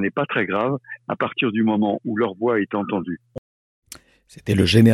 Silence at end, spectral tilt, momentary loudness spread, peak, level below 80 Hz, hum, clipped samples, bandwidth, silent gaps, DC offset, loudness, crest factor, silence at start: 0 s; -6.5 dB/octave; 21 LU; -2 dBFS; -50 dBFS; none; under 0.1%; 14.5 kHz; 3.38-3.82 s; under 0.1%; -22 LUFS; 20 dB; 0 s